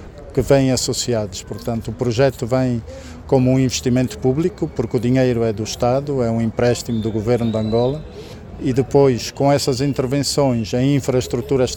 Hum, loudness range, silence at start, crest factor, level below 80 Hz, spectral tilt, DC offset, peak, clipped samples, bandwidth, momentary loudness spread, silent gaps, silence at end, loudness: none; 2 LU; 0 s; 16 dB; -40 dBFS; -6 dB/octave; under 0.1%; -2 dBFS; under 0.1%; 17 kHz; 10 LU; none; 0 s; -19 LUFS